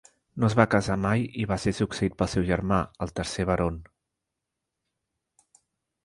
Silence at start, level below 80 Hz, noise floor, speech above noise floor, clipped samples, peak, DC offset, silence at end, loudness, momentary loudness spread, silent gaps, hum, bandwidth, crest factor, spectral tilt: 0.35 s; -44 dBFS; -85 dBFS; 59 dB; under 0.1%; -4 dBFS; under 0.1%; 2.2 s; -26 LUFS; 9 LU; none; none; 11.5 kHz; 24 dB; -6.5 dB/octave